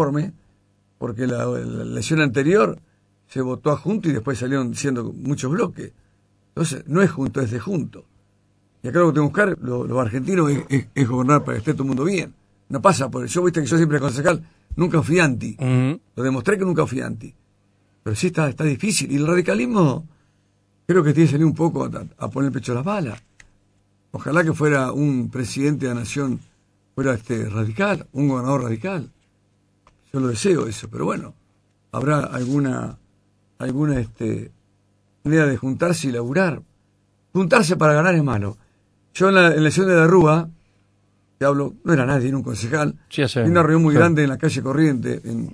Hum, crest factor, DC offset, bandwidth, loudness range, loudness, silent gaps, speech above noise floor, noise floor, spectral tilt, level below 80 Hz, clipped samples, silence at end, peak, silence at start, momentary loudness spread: 50 Hz at -45 dBFS; 20 dB; under 0.1%; 11 kHz; 7 LU; -20 LUFS; none; 43 dB; -62 dBFS; -6.5 dB/octave; -50 dBFS; under 0.1%; 0 s; 0 dBFS; 0 s; 14 LU